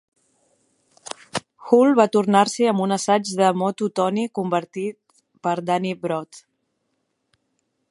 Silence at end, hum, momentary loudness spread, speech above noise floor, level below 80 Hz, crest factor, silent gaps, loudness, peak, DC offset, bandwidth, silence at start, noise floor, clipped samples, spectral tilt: 1.5 s; none; 14 LU; 54 dB; -72 dBFS; 20 dB; none; -21 LUFS; -2 dBFS; under 0.1%; 11.5 kHz; 1.35 s; -73 dBFS; under 0.1%; -5 dB/octave